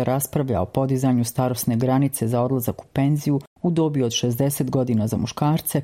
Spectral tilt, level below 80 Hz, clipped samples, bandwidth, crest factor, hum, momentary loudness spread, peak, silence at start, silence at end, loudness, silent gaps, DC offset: -6 dB/octave; -52 dBFS; under 0.1%; 16.5 kHz; 16 dB; none; 4 LU; -6 dBFS; 0 s; 0 s; -22 LUFS; 3.47-3.56 s; under 0.1%